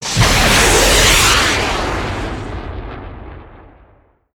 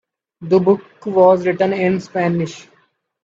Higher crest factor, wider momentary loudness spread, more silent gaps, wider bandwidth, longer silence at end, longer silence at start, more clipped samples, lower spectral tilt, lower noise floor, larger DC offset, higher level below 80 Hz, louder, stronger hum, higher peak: about the same, 14 dB vs 16 dB; first, 20 LU vs 9 LU; neither; first, over 20 kHz vs 7.6 kHz; first, 0.8 s vs 0.65 s; second, 0 s vs 0.4 s; neither; second, -2.5 dB/octave vs -7.5 dB/octave; second, -51 dBFS vs -60 dBFS; neither; first, -24 dBFS vs -60 dBFS; first, -11 LUFS vs -16 LUFS; neither; about the same, 0 dBFS vs 0 dBFS